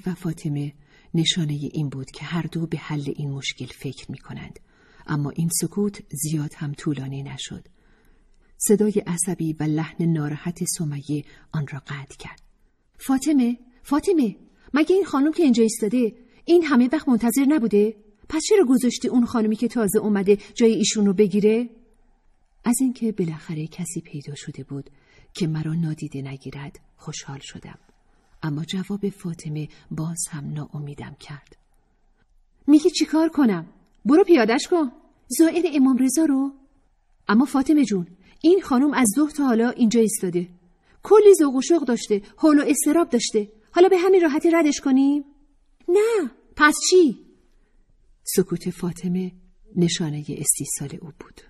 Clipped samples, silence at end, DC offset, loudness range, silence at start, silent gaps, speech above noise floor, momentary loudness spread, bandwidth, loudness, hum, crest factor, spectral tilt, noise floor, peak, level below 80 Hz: under 0.1%; 0.4 s; under 0.1%; 12 LU; 0.05 s; none; 41 dB; 17 LU; 14.5 kHz; -21 LUFS; none; 18 dB; -5 dB/octave; -61 dBFS; -4 dBFS; -56 dBFS